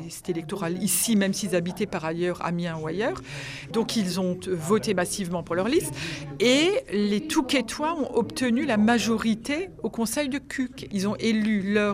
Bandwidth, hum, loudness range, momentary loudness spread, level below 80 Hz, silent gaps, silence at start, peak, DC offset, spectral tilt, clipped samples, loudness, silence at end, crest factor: 15.5 kHz; none; 4 LU; 9 LU; -54 dBFS; none; 0 s; -8 dBFS; under 0.1%; -4.5 dB/octave; under 0.1%; -26 LUFS; 0 s; 18 dB